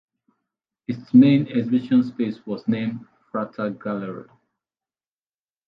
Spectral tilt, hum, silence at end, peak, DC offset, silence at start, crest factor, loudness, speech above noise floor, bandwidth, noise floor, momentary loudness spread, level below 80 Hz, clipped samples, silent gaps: -9.5 dB/octave; none; 1.45 s; -4 dBFS; under 0.1%; 0.9 s; 20 dB; -22 LUFS; over 69 dB; 5.2 kHz; under -90 dBFS; 18 LU; -70 dBFS; under 0.1%; none